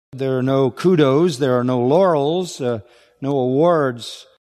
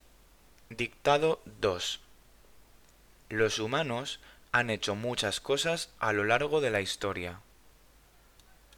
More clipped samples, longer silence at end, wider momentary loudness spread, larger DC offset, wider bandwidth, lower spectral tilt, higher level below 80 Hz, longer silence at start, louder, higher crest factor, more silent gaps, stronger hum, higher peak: neither; second, 0.3 s vs 1.4 s; about the same, 14 LU vs 12 LU; neither; second, 13.5 kHz vs 19.5 kHz; first, -7 dB/octave vs -3.5 dB/octave; about the same, -64 dBFS vs -60 dBFS; second, 0.15 s vs 0.7 s; first, -17 LUFS vs -30 LUFS; second, 16 dB vs 22 dB; neither; neither; first, -2 dBFS vs -10 dBFS